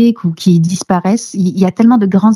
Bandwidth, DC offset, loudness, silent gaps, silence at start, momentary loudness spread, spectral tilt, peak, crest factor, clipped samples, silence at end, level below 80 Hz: 12.5 kHz; under 0.1%; -12 LUFS; none; 0 s; 5 LU; -7 dB/octave; 0 dBFS; 10 dB; under 0.1%; 0 s; -56 dBFS